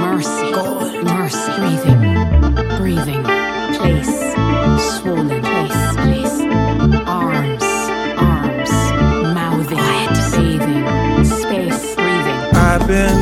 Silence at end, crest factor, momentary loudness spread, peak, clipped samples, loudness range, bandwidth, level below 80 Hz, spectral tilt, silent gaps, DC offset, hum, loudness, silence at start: 0 s; 14 dB; 5 LU; 0 dBFS; under 0.1%; 1 LU; 17 kHz; -24 dBFS; -5.5 dB/octave; none; under 0.1%; none; -16 LUFS; 0 s